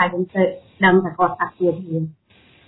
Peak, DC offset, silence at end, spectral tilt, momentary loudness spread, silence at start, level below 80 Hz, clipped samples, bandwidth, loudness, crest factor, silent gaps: -2 dBFS; under 0.1%; 0.55 s; -10.5 dB/octave; 11 LU; 0 s; -58 dBFS; under 0.1%; 4.1 kHz; -19 LUFS; 18 dB; none